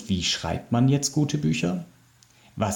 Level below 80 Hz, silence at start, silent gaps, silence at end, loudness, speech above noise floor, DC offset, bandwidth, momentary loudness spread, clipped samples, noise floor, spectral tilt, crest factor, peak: -54 dBFS; 0 s; none; 0 s; -25 LUFS; 33 dB; under 0.1%; 18 kHz; 9 LU; under 0.1%; -57 dBFS; -5 dB/octave; 16 dB; -10 dBFS